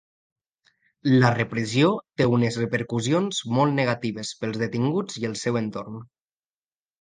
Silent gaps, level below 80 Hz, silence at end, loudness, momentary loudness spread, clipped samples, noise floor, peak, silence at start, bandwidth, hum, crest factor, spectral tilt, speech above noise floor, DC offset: none; -62 dBFS; 0.95 s; -24 LUFS; 10 LU; under 0.1%; under -90 dBFS; -2 dBFS; 1.05 s; 9.8 kHz; none; 22 dB; -6 dB/octave; over 67 dB; under 0.1%